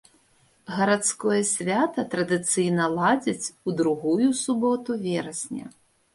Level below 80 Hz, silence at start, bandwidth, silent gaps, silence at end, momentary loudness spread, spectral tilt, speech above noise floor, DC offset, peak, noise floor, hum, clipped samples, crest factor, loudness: -68 dBFS; 0.7 s; 11.5 kHz; none; 0.45 s; 8 LU; -4.5 dB/octave; 38 dB; under 0.1%; -8 dBFS; -62 dBFS; none; under 0.1%; 16 dB; -24 LUFS